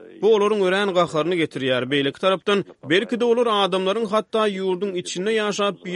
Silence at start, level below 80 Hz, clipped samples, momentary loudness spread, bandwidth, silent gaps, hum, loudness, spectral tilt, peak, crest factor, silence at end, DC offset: 0 s; -68 dBFS; under 0.1%; 5 LU; 11.5 kHz; none; none; -21 LUFS; -4.5 dB/octave; -6 dBFS; 16 dB; 0 s; under 0.1%